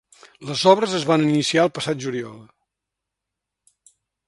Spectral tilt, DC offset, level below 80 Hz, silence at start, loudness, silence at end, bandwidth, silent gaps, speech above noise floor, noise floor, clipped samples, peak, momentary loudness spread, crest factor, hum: -5 dB/octave; under 0.1%; -66 dBFS; 0.4 s; -20 LUFS; 1.85 s; 11.5 kHz; none; 64 dB; -84 dBFS; under 0.1%; 0 dBFS; 14 LU; 22 dB; none